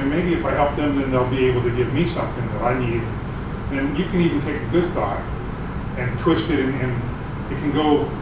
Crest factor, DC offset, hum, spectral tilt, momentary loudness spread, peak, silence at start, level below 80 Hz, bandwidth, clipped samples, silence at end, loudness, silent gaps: 16 dB; under 0.1%; none; -11.5 dB/octave; 9 LU; -4 dBFS; 0 s; -34 dBFS; 4 kHz; under 0.1%; 0 s; -22 LUFS; none